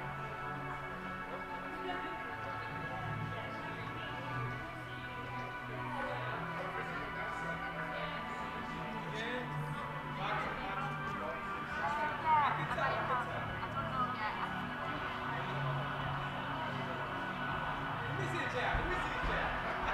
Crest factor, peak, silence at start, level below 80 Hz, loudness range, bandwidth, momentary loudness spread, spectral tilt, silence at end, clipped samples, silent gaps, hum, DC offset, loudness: 18 dB; -20 dBFS; 0 s; -54 dBFS; 6 LU; 15.5 kHz; 7 LU; -6 dB/octave; 0 s; under 0.1%; none; none; under 0.1%; -38 LUFS